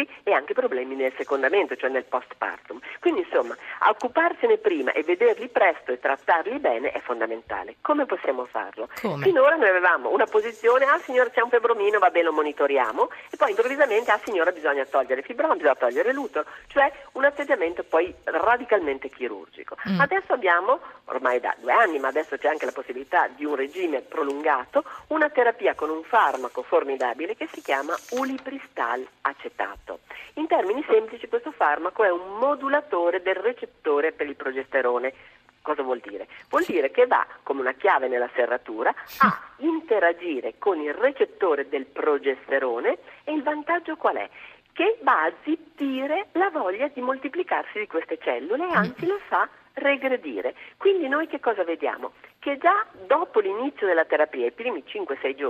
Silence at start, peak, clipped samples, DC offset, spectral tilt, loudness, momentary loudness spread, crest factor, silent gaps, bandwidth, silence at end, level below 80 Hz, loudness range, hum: 0 s; -6 dBFS; under 0.1%; under 0.1%; -5.5 dB/octave; -24 LUFS; 10 LU; 18 dB; none; 14 kHz; 0 s; -66 dBFS; 5 LU; none